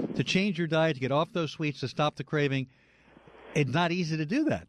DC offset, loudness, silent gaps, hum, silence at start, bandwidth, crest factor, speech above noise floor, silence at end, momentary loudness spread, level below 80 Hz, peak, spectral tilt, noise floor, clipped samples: under 0.1%; -29 LUFS; none; none; 0 s; 10.5 kHz; 14 dB; 29 dB; 0.05 s; 6 LU; -62 dBFS; -14 dBFS; -6 dB/octave; -57 dBFS; under 0.1%